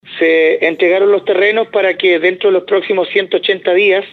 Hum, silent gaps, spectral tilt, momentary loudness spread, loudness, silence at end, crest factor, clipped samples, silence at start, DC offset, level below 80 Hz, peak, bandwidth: none; none; -6 dB/octave; 3 LU; -12 LUFS; 0.05 s; 12 dB; under 0.1%; 0.05 s; under 0.1%; -68 dBFS; 0 dBFS; 6 kHz